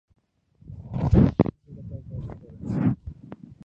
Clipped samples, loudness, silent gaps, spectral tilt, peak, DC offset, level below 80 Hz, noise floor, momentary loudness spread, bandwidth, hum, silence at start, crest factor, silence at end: under 0.1%; -24 LUFS; none; -10.5 dB/octave; -2 dBFS; under 0.1%; -36 dBFS; -59 dBFS; 24 LU; 7 kHz; none; 0.7 s; 24 dB; 0.3 s